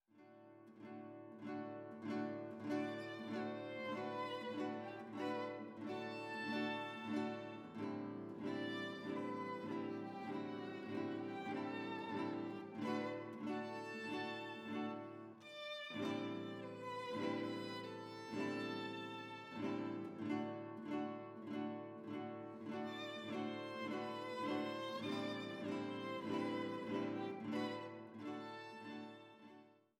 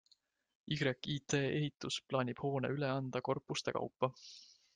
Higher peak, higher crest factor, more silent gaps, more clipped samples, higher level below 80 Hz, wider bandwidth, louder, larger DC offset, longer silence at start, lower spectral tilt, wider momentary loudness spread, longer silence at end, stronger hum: second, -28 dBFS vs -18 dBFS; about the same, 18 dB vs 22 dB; neither; neither; second, -90 dBFS vs -72 dBFS; first, 13 kHz vs 9.6 kHz; second, -46 LUFS vs -38 LUFS; neither; second, 0.15 s vs 0.65 s; about the same, -6 dB/octave vs -5 dB/octave; about the same, 8 LU vs 6 LU; about the same, 0.2 s vs 0.3 s; neither